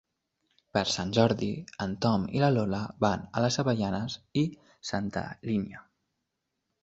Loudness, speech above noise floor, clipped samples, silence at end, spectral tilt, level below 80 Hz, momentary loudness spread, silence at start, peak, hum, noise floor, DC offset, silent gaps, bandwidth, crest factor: -29 LUFS; 54 dB; under 0.1%; 1 s; -5.5 dB/octave; -56 dBFS; 9 LU; 0.75 s; -8 dBFS; none; -83 dBFS; under 0.1%; none; 8.2 kHz; 22 dB